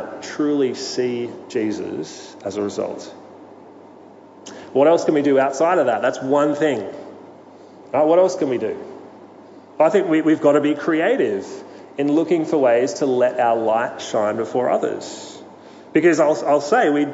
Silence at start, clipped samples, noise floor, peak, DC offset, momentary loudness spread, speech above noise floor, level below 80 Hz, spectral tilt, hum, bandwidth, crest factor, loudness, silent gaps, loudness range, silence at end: 0 s; under 0.1%; -43 dBFS; -2 dBFS; under 0.1%; 17 LU; 25 dB; -74 dBFS; -5.5 dB/octave; none; 8 kHz; 16 dB; -19 LUFS; none; 6 LU; 0 s